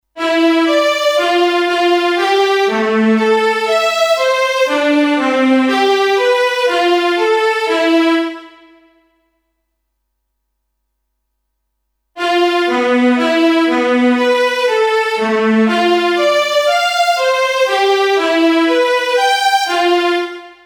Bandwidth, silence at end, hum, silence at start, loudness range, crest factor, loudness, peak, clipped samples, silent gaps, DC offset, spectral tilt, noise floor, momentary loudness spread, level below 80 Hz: over 20 kHz; 0.15 s; none; 0.15 s; 6 LU; 12 dB; -13 LUFS; -2 dBFS; under 0.1%; none; under 0.1%; -3.5 dB/octave; -71 dBFS; 2 LU; -62 dBFS